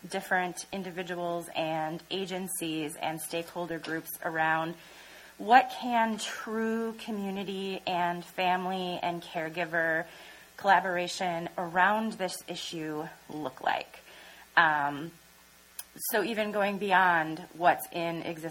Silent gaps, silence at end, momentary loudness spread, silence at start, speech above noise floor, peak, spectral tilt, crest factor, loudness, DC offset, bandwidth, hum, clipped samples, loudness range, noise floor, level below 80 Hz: none; 0 s; 15 LU; 0.05 s; 27 dB; -6 dBFS; -4 dB/octave; 24 dB; -30 LUFS; under 0.1%; 16.5 kHz; none; under 0.1%; 4 LU; -57 dBFS; -70 dBFS